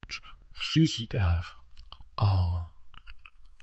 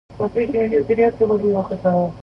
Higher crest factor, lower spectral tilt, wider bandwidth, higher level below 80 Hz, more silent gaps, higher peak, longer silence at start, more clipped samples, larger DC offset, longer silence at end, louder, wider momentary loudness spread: about the same, 18 dB vs 14 dB; second, -6 dB/octave vs -9.5 dB/octave; first, 8.4 kHz vs 5.8 kHz; about the same, -42 dBFS vs -46 dBFS; neither; second, -12 dBFS vs -4 dBFS; about the same, 0.05 s vs 0.1 s; neither; neither; about the same, 0 s vs 0 s; second, -29 LUFS vs -19 LUFS; first, 17 LU vs 4 LU